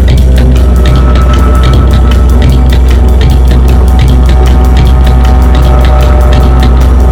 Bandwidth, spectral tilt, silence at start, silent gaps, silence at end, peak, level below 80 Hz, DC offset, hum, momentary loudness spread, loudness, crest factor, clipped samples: 9.6 kHz; -7 dB/octave; 0 s; none; 0 s; 0 dBFS; -4 dBFS; under 0.1%; none; 1 LU; -6 LUFS; 2 dB; 8%